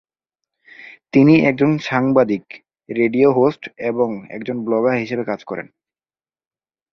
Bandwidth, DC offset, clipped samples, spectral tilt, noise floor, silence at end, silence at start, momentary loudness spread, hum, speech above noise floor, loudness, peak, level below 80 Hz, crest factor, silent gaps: 6.6 kHz; under 0.1%; under 0.1%; -8 dB/octave; under -90 dBFS; 1.3 s; 0.8 s; 14 LU; none; over 73 dB; -17 LUFS; -2 dBFS; -58 dBFS; 18 dB; none